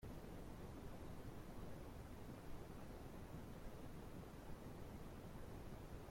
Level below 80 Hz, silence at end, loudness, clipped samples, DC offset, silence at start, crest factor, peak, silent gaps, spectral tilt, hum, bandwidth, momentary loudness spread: -60 dBFS; 0 s; -56 LUFS; under 0.1%; under 0.1%; 0 s; 12 dB; -40 dBFS; none; -6.5 dB/octave; none; 16.5 kHz; 1 LU